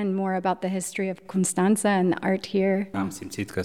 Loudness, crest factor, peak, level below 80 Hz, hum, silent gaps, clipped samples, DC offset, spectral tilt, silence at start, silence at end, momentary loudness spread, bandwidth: -25 LUFS; 14 dB; -10 dBFS; -64 dBFS; none; none; under 0.1%; 0.2%; -5.5 dB/octave; 0 s; 0 s; 9 LU; 14.5 kHz